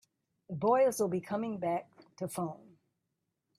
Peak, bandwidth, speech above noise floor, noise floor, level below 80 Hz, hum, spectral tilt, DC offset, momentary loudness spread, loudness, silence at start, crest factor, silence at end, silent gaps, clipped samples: -18 dBFS; 15.5 kHz; 53 dB; -84 dBFS; -78 dBFS; none; -6 dB/octave; under 0.1%; 15 LU; -33 LUFS; 0.5 s; 18 dB; 1 s; none; under 0.1%